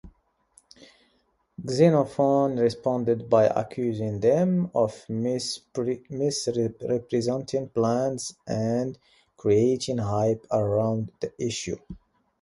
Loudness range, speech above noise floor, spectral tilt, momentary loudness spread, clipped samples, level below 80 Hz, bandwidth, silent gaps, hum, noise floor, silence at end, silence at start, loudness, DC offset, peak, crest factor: 4 LU; 44 dB; -6 dB/octave; 10 LU; under 0.1%; -58 dBFS; 11.5 kHz; none; none; -69 dBFS; 0.45 s; 0.05 s; -25 LUFS; under 0.1%; -6 dBFS; 20 dB